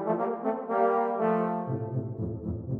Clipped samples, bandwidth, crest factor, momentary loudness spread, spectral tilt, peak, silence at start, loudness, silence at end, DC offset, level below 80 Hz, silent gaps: under 0.1%; 4 kHz; 16 dB; 8 LU; -11 dB/octave; -12 dBFS; 0 s; -29 LUFS; 0 s; under 0.1%; -54 dBFS; none